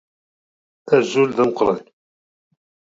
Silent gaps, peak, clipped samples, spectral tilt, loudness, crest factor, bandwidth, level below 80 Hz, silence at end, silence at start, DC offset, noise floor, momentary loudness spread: none; -2 dBFS; under 0.1%; -5.5 dB/octave; -18 LUFS; 20 dB; 7.8 kHz; -58 dBFS; 1.15 s; 0.85 s; under 0.1%; under -90 dBFS; 4 LU